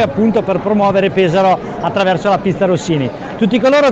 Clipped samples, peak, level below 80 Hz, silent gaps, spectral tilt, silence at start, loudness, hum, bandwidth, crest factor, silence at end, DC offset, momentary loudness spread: under 0.1%; -2 dBFS; -44 dBFS; none; -6.5 dB/octave; 0 s; -14 LUFS; none; 8.2 kHz; 12 dB; 0 s; under 0.1%; 6 LU